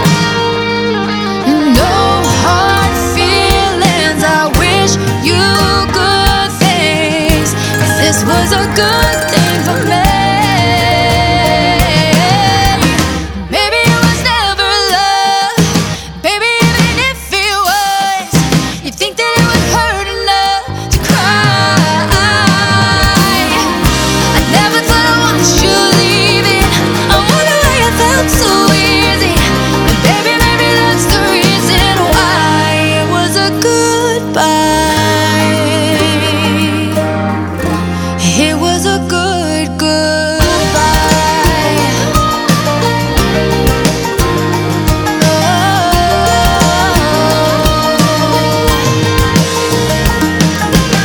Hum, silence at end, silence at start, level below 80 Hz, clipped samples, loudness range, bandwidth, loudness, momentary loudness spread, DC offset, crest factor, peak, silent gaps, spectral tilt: none; 0 s; 0 s; -22 dBFS; 0.1%; 3 LU; over 20 kHz; -10 LUFS; 4 LU; under 0.1%; 10 dB; 0 dBFS; none; -4 dB/octave